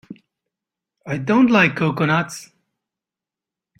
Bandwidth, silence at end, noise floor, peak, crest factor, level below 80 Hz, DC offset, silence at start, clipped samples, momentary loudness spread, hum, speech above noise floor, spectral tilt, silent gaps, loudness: 14.5 kHz; 1.35 s; -88 dBFS; -4 dBFS; 18 dB; -60 dBFS; under 0.1%; 0.1 s; under 0.1%; 15 LU; none; 71 dB; -6 dB/octave; none; -17 LUFS